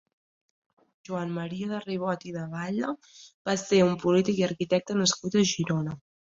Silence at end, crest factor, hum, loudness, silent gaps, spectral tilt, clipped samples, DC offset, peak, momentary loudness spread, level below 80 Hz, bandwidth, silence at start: 0.3 s; 18 dB; none; -27 LUFS; 3.34-3.45 s; -5 dB/octave; under 0.1%; under 0.1%; -10 dBFS; 11 LU; -66 dBFS; 7.8 kHz; 1.1 s